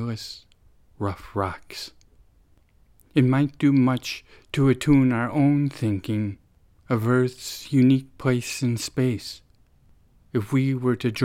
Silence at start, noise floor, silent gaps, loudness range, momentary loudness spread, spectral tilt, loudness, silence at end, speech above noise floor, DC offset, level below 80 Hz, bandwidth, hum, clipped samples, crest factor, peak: 0 s; -58 dBFS; none; 5 LU; 16 LU; -6.5 dB/octave; -23 LUFS; 0 s; 36 dB; under 0.1%; -50 dBFS; 15.5 kHz; none; under 0.1%; 16 dB; -8 dBFS